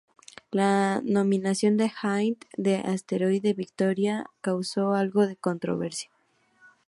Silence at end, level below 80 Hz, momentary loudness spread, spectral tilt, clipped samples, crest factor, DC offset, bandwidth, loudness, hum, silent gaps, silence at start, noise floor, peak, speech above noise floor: 0.85 s; -72 dBFS; 7 LU; -6 dB/octave; under 0.1%; 16 dB; under 0.1%; 11.5 kHz; -26 LUFS; none; none; 0.5 s; -63 dBFS; -10 dBFS; 37 dB